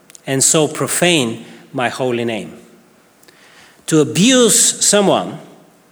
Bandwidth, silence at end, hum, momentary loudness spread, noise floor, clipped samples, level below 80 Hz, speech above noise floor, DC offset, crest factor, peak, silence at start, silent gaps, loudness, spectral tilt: over 20 kHz; 0.45 s; none; 19 LU; -49 dBFS; under 0.1%; -64 dBFS; 35 dB; under 0.1%; 16 dB; 0 dBFS; 0.25 s; none; -13 LUFS; -3 dB/octave